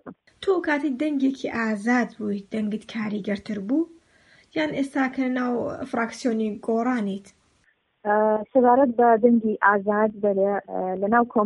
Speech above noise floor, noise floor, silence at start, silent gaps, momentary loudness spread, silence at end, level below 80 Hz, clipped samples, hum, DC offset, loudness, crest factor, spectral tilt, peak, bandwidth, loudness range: 43 dB; -66 dBFS; 0.05 s; none; 11 LU; 0 s; -64 dBFS; under 0.1%; none; under 0.1%; -23 LUFS; 20 dB; -6.5 dB/octave; -4 dBFS; 11 kHz; 7 LU